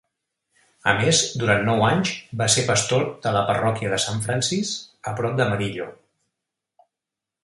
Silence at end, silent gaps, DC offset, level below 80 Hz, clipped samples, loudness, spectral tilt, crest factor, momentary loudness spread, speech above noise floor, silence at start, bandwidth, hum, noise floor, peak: 1.5 s; none; under 0.1%; -54 dBFS; under 0.1%; -21 LUFS; -3.5 dB/octave; 22 dB; 10 LU; 65 dB; 0.85 s; 11.5 kHz; none; -86 dBFS; -2 dBFS